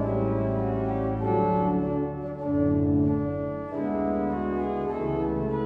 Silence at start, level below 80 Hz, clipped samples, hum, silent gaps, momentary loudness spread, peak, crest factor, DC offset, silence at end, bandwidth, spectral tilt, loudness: 0 s; -44 dBFS; under 0.1%; none; none; 6 LU; -12 dBFS; 14 dB; under 0.1%; 0 s; 4.3 kHz; -11.5 dB/octave; -27 LUFS